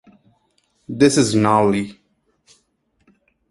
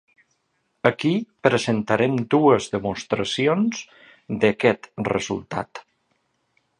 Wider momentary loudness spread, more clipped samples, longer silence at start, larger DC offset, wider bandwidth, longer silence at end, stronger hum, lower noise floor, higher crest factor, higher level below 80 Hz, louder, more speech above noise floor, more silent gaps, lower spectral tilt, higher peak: first, 16 LU vs 12 LU; neither; about the same, 0.9 s vs 0.85 s; neither; about the same, 11.5 kHz vs 11 kHz; first, 1.6 s vs 1 s; neither; second, -66 dBFS vs -71 dBFS; about the same, 20 dB vs 22 dB; about the same, -54 dBFS vs -58 dBFS; first, -16 LUFS vs -22 LUFS; about the same, 50 dB vs 50 dB; neither; about the same, -5 dB/octave vs -5.5 dB/octave; about the same, -2 dBFS vs 0 dBFS